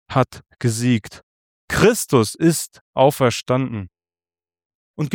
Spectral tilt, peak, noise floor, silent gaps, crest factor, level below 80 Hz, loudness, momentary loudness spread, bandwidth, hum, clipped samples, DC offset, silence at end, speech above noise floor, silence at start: -5.5 dB/octave; -2 dBFS; under -90 dBFS; 1.23-1.68 s, 2.81-2.93 s, 4.65-4.94 s; 18 dB; -48 dBFS; -19 LUFS; 12 LU; 18.5 kHz; none; under 0.1%; under 0.1%; 0 s; over 72 dB; 0.1 s